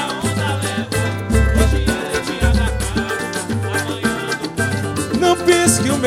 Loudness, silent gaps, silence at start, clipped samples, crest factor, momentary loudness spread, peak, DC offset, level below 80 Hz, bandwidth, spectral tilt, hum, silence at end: -18 LUFS; none; 0 s; under 0.1%; 18 dB; 8 LU; 0 dBFS; under 0.1%; -24 dBFS; 16 kHz; -4.5 dB/octave; none; 0 s